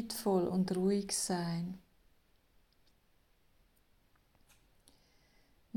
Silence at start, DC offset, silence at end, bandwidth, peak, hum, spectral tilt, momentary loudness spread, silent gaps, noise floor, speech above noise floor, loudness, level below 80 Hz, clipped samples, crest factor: 0 s; under 0.1%; 3.95 s; 17 kHz; -20 dBFS; none; -5 dB/octave; 10 LU; none; -70 dBFS; 37 dB; -34 LUFS; -70 dBFS; under 0.1%; 18 dB